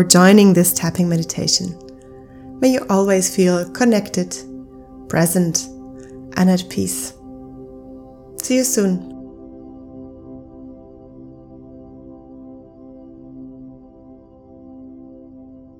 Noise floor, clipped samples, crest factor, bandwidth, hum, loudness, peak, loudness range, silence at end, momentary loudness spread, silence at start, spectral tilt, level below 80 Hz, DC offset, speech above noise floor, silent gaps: -43 dBFS; under 0.1%; 20 dB; 19 kHz; none; -17 LUFS; 0 dBFS; 22 LU; 0.4 s; 25 LU; 0 s; -4.5 dB/octave; -50 dBFS; under 0.1%; 28 dB; none